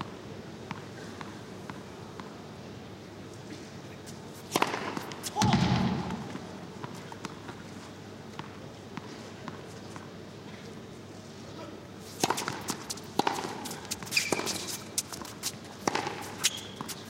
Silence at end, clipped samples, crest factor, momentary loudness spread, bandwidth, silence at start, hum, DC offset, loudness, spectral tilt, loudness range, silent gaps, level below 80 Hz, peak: 0 s; under 0.1%; 28 dB; 16 LU; 16.5 kHz; 0 s; none; under 0.1%; -35 LUFS; -3.5 dB/octave; 12 LU; none; -58 dBFS; -8 dBFS